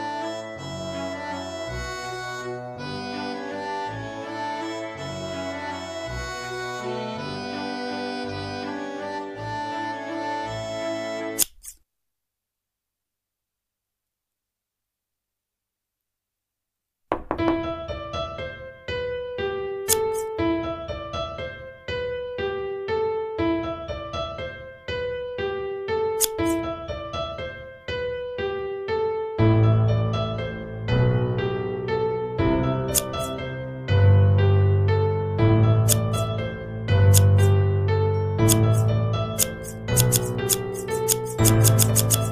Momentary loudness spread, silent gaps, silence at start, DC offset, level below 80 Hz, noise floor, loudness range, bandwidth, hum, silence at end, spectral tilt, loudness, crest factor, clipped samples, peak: 13 LU; none; 0 s; under 0.1%; -44 dBFS; -85 dBFS; 11 LU; 15.5 kHz; 50 Hz at -55 dBFS; 0 s; -5 dB/octave; -24 LUFS; 22 dB; under 0.1%; -2 dBFS